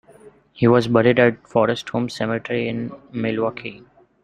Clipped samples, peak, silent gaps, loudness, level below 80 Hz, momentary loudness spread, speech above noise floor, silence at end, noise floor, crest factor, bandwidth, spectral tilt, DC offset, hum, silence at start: under 0.1%; 0 dBFS; none; -20 LUFS; -56 dBFS; 13 LU; 29 dB; 0.45 s; -48 dBFS; 20 dB; 10 kHz; -7 dB/octave; under 0.1%; none; 0.25 s